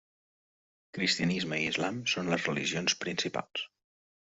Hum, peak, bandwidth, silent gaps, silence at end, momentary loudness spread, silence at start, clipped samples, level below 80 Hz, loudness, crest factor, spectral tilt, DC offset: none; -12 dBFS; 8.2 kHz; none; 0.7 s; 10 LU; 0.95 s; under 0.1%; -68 dBFS; -31 LUFS; 22 dB; -3.5 dB/octave; under 0.1%